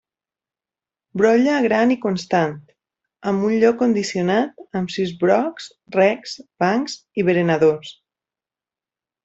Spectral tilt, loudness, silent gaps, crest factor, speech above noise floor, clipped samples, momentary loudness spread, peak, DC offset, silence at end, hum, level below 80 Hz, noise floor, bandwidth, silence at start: -6 dB/octave; -19 LUFS; none; 18 dB; over 71 dB; under 0.1%; 12 LU; -4 dBFS; under 0.1%; 1.35 s; none; -62 dBFS; under -90 dBFS; 8 kHz; 1.15 s